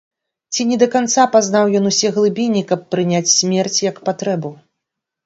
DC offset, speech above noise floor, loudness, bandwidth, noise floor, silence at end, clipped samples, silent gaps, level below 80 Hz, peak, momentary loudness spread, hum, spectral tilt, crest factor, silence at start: under 0.1%; 64 dB; -16 LUFS; 8 kHz; -80 dBFS; 0.7 s; under 0.1%; none; -64 dBFS; 0 dBFS; 9 LU; none; -3.5 dB/octave; 16 dB; 0.5 s